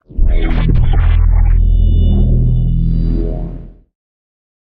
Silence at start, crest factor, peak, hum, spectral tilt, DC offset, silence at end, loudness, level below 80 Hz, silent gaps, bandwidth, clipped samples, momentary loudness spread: 0.1 s; 10 dB; -2 dBFS; none; -11 dB/octave; under 0.1%; 0.9 s; -15 LUFS; -12 dBFS; none; 3.8 kHz; under 0.1%; 8 LU